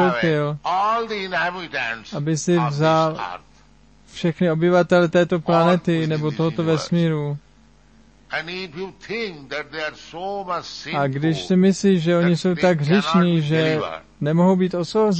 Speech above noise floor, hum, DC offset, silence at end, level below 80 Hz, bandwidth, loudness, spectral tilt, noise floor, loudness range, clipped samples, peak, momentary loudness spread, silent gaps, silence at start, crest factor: 33 dB; none; 0.1%; 0 s; -56 dBFS; 8.6 kHz; -20 LUFS; -6.5 dB/octave; -53 dBFS; 8 LU; under 0.1%; -6 dBFS; 12 LU; none; 0 s; 16 dB